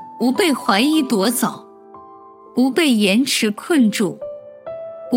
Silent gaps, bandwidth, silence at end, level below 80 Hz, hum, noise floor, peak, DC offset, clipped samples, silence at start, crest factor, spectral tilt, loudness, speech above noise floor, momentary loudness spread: none; 16.5 kHz; 0 s; -70 dBFS; none; -42 dBFS; -2 dBFS; under 0.1%; under 0.1%; 0 s; 16 dB; -4 dB/octave; -17 LUFS; 25 dB; 17 LU